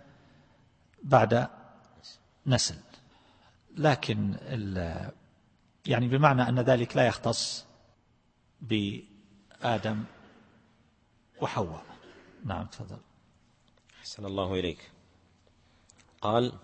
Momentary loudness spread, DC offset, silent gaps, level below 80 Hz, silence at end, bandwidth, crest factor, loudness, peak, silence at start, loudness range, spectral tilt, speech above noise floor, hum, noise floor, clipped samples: 23 LU; under 0.1%; none; -58 dBFS; 0.05 s; 8.8 kHz; 26 dB; -29 LUFS; -6 dBFS; 1 s; 11 LU; -5.5 dB/octave; 39 dB; none; -67 dBFS; under 0.1%